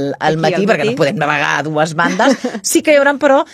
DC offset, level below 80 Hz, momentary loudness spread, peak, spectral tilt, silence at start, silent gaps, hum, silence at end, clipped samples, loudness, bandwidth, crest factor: under 0.1%; -56 dBFS; 4 LU; 0 dBFS; -4 dB/octave; 0 s; none; none; 0.1 s; under 0.1%; -13 LUFS; 15 kHz; 14 dB